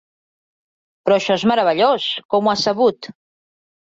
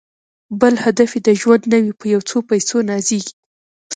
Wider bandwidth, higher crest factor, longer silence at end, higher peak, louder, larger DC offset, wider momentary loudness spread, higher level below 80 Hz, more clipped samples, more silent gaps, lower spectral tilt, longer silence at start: second, 8 kHz vs 9.4 kHz; about the same, 16 dB vs 16 dB; first, 0.7 s vs 0 s; second, -4 dBFS vs 0 dBFS; about the same, -17 LUFS vs -15 LUFS; neither; about the same, 9 LU vs 7 LU; about the same, -62 dBFS vs -60 dBFS; neither; second, 2.25-2.29 s vs 3.33-3.90 s; about the same, -4.5 dB/octave vs -4.5 dB/octave; first, 1.05 s vs 0.5 s